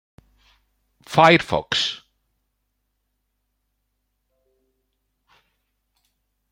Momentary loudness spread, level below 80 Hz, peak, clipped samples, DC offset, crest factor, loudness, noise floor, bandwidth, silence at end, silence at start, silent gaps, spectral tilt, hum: 11 LU; -58 dBFS; -2 dBFS; under 0.1%; under 0.1%; 24 dB; -18 LUFS; -74 dBFS; 16.5 kHz; 4.55 s; 1.1 s; none; -4.5 dB/octave; none